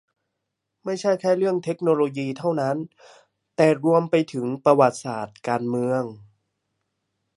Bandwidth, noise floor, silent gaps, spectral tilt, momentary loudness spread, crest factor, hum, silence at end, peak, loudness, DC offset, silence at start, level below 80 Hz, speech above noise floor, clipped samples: 11.5 kHz; -80 dBFS; none; -6.5 dB/octave; 13 LU; 20 dB; none; 1.2 s; -2 dBFS; -22 LUFS; under 0.1%; 0.85 s; -72 dBFS; 58 dB; under 0.1%